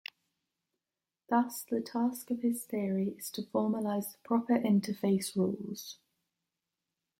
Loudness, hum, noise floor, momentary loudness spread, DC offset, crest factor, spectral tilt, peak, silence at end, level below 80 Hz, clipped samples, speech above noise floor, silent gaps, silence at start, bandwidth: -33 LUFS; none; under -90 dBFS; 11 LU; under 0.1%; 20 dB; -6 dB/octave; -14 dBFS; 1.25 s; -78 dBFS; under 0.1%; over 58 dB; none; 1.3 s; 16.5 kHz